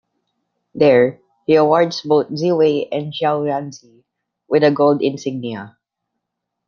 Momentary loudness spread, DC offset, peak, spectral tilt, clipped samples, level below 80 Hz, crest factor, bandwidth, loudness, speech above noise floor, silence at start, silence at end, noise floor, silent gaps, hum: 14 LU; under 0.1%; -2 dBFS; -6.5 dB/octave; under 0.1%; -64 dBFS; 16 dB; 7 kHz; -17 LUFS; 63 dB; 0.75 s; 1 s; -78 dBFS; none; none